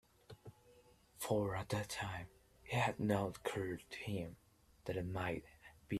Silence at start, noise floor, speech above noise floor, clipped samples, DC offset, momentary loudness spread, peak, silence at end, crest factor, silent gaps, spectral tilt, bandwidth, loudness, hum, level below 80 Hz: 0.3 s; -67 dBFS; 27 dB; under 0.1%; under 0.1%; 21 LU; -22 dBFS; 0 s; 22 dB; none; -5.5 dB/octave; 14.5 kHz; -41 LUFS; none; -66 dBFS